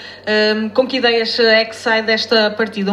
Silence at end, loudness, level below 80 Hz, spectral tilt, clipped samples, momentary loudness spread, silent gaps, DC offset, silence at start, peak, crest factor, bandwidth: 0 s; -15 LUFS; -62 dBFS; -4 dB/octave; under 0.1%; 5 LU; none; under 0.1%; 0 s; 0 dBFS; 14 dB; 12 kHz